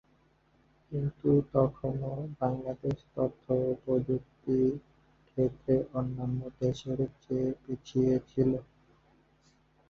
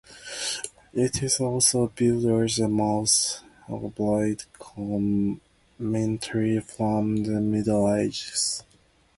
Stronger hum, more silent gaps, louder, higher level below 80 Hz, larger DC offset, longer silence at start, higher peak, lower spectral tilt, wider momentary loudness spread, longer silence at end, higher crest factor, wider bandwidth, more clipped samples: neither; neither; second, -32 LUFS vs -25 LUFS; about the same, -56 dBFS vs -54 dBFS; neither; first, 0.9 s vs 0.1 s; second, -12 dBFS vs -8 dBFS; first, -9.5 dB/octave vs -4.5 dB/octave; second, 7 LU vs 14 LU; first, 1.25 s vs 0.55 s; about the same, 20 dB vs 18 dB; second, 7.2 kHz vs 12 kHz; neither